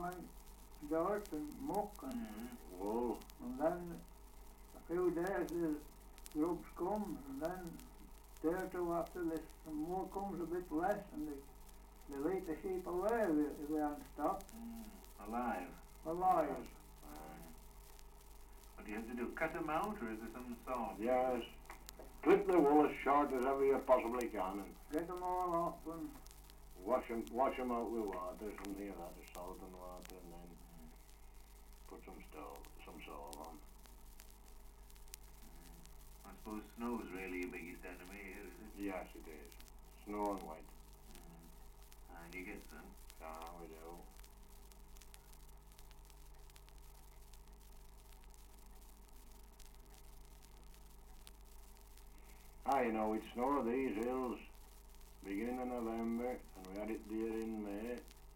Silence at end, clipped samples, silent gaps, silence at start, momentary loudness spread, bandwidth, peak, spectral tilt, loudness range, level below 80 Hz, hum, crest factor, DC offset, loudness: 0 s; under 0.1%; none; 0 s; 24 LU; 17 kHz; -18 dBFS; -6 dB/octave; 24 LU; -58 dBFS; 50 Hz at -65 dBFS; 24 dB; under 0.1%; -41 LUFS